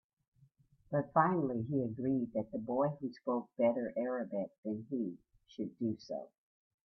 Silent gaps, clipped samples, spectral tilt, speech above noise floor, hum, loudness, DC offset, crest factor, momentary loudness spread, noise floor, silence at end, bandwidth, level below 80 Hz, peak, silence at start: 4.58-4.63 s; under 0.1%; -9.5 dB/octave; 33 dB; none; -36 LUFS; under 0.1%; 22 dB; 12 LU; -68 dBFS; 0.6 s; 6.2 kHz; -74 dBFS; -14 dBFS; 0.9 s